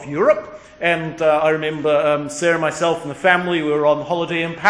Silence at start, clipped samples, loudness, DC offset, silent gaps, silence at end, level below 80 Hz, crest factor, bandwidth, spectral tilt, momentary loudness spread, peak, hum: 0 s; under 0.1%; -18 LUFS; under 0.1%; none; 0 s; -56 dBFS; 18 dB; 10.5 kHz; -5 dB/octave; 5 LU; 0 dBFS; none